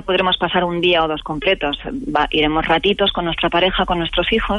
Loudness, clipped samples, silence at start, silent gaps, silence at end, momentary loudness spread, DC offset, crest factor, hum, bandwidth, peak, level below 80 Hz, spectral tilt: -17 LUFS; under 0.1%; 0 s; none; 0 s; 5 LU; under 0.1%; 14 dB; none; 10.5 kHz; -4 dBFS; -34 dBFS; -6.5 dB/octave